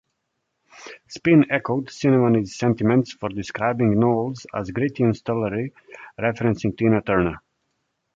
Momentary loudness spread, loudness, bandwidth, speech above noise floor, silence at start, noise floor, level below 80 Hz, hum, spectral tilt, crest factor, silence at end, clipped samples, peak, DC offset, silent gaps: 12 LU; -21 LUFS; 7.8 kHz; 55 dB; 0.8 s; -76 dBFS; -50 dBFS; none; -7.5 dB/octave; 18 dB; 0.8 s; under 0.1%; -4 dBFS; under 0.1%; none